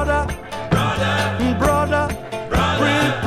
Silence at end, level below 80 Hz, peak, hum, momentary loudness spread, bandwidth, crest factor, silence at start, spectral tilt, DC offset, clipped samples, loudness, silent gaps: 0 s; -32 dBFS; -4 dBFS; none; 8 LU; 15 kHz; 16 dB; 0 s; -5.5 dB/octave; under 0.1%; under 0.1%; -19 LUFS; none